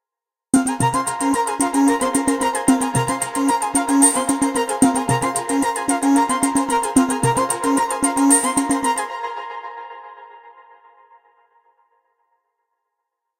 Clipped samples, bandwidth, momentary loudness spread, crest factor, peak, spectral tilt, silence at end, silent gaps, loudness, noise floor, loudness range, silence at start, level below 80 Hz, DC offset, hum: under 0.1%; 17 kHz; 10 LU; 20 dB; 0 dBFS; -4 dB/octave; 2.9 s; none; -18 LUFS; -87 dBFS; 8 LU; 0.55 s; -52 dBFS; under 0.1%; none